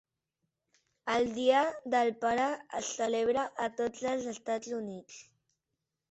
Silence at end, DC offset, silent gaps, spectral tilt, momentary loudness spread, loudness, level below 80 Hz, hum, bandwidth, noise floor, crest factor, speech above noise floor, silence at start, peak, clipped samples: 0.9 s; under 0.1%; none; -3 dB/octave; 13 LU; -32 LUFS; -72 dBFS; none; 8.4 kHz; -87 dBFS; 20 dB; 55 dB; 1.05 s; -14 dBFS; under 0.1%